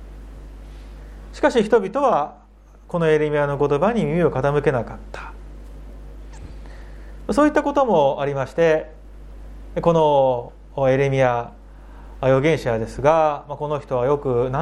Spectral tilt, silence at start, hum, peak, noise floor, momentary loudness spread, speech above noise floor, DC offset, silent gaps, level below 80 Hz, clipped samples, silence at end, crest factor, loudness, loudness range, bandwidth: -7 dB/octave; 0 s; 50 Hz at -40 dBFS; -2 dBFS; -40 dBFS; 24 LU; 21 dB; under 0.1%; none; -40 dBFS; under 0.1%; 0 s; 20 dB; -20 LUFS; 4 LU; 11.5 kHz